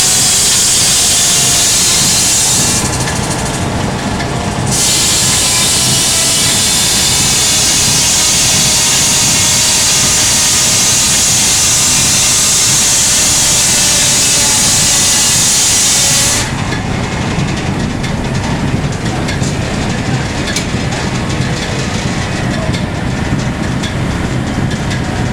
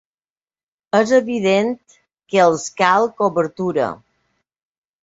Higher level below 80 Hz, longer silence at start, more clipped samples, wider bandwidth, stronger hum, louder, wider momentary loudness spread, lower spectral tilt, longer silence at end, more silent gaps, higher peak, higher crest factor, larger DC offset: first, -28 dBFS vs -62 dBFS; second, 0 s vs 0.95 s; neither; first, over 20 kHz vs 8 kHz; neither; first, -9 LUFS vs -17 LUFS; about the same, 9 LU vs 9 LU; second, -2 dB/octave vs -5 dB/octave; second, 0 s vs 1.1 s; neither; about the same, 0 dBFS vs -2 dBFS; second, 12 dB vs 18 dB; neither